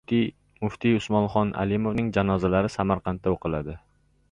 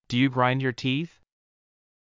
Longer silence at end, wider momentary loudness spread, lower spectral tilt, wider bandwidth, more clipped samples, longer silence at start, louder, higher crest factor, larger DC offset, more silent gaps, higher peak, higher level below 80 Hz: second, 0.55 s vs 1.05 s; about the same, 9 LU vs 8 LU; about the same, -7.5 dB/octave vs -6.5 dB/octave; first, 9.8 kHz vs 7.6 kHz; neither; about the same, 0.1 s vs 0.1 s; about the same, -25 LUFS vs -25 LUFS; about the same, 18 dB vs 18 dB; neither; neither; about the same, -8 dBFS vs -10 dBFS; first, -46 dBFS vs -64 dBFS